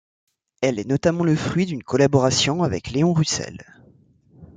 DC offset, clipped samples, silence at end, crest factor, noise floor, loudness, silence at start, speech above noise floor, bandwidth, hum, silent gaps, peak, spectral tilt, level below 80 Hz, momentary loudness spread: under 0.1%; under 0.1%; 0.1 s; 18 dB; -55 dBFS; -21 LUFS; 0.6 s; 34 dB; 9.6 kHz; none; none; -4 dBFS; -5 dB/octave; -52 dBFS; 7 LU